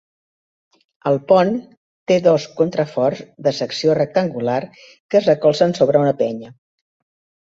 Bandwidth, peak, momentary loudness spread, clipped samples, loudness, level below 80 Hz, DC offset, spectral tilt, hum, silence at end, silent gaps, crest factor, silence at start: 7.8 kHz; -2 dBFS; 9 LU; under 0.1%; -18 LUFS; -60 dBFS; under 0.1%; -6.5 dB/octave; none; 0.95 s; 1.77-2.06 s, 5.00-5.09 s; 18 dB; 1.05 s